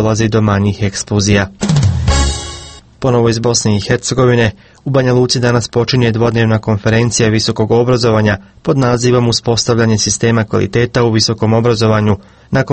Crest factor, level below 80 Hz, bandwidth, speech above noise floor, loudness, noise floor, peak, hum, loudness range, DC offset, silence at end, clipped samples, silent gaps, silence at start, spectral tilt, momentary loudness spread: 12 dB; -28 dBFS; 8.8 kHz; 21 dB; -12 LUFS; -32 dBFS; 0 dBFS; none; 2 LU; under 0.1%; 0 s; under 0.1%; none; 0 s; -5 dB/octave; 5 LU